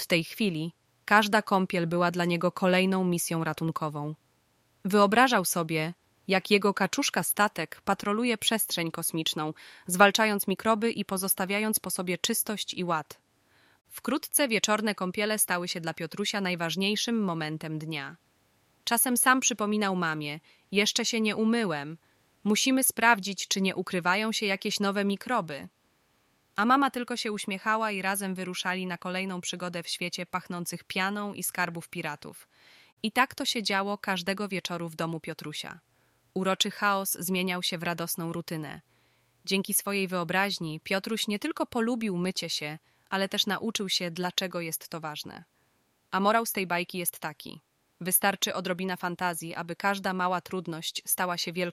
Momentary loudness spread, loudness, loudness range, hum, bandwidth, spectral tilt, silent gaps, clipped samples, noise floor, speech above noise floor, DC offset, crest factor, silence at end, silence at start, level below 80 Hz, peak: 13 LU; -28 LUFS; 5 LU; none; 16 kHz; -3.5 dB/octave; 32.92-32.97 s; under 0.1%; -70 dBFS; 42 dB; under 0.1%; 24 dB; 0 s; 0 s; -72 dBFS; -6 dBFS